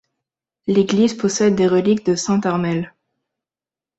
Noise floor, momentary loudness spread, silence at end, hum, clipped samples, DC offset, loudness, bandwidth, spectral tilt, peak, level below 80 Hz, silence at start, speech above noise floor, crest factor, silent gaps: under -90 dBFS; 9 LU; 1.1 s; none; under 0.1%; under 0.1%; -18 LUFS; 8.2 kHz; -5.5 dB/octave; -4 dBFS; -58 dBFS; 0.65 s; over 73 dB; 16 dB; none